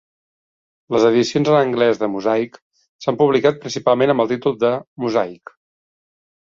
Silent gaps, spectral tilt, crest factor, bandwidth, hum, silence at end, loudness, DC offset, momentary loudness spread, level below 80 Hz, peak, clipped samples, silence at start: 2.62-2.71 s, 2.89-2.99 s, 4.87-4.96 s; -6 dB/octave; 16 dB; 7.6 kHz; none; 1.1 s; -18 LUFS; under 0.1%; 8 LU; -60 dBFS; -2 dBFS; under 0.1%; 0.9 s